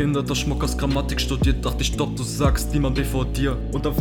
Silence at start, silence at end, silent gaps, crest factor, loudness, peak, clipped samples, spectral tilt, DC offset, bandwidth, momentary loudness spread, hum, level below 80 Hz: 0 s; 0 s; none; 16 dB; -23 LUFS; -6 dBFS; under 0.1%; -5.5 dB/octave; under 0.1%; 18.5 kHz; 3 LU; none; -26 dBFS